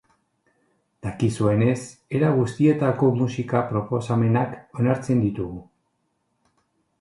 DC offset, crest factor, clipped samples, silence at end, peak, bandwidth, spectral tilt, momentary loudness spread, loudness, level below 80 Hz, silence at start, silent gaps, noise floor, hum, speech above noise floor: under 0.1%; 18 dB; under 0.1%; 1.4 s; -4 dBFS; 11.5 kHz; -8 dB/octave; 10 LU; -23 LUFS; -52 dBFS; 1.05 s; none; -72 dBFS; none; 51 dB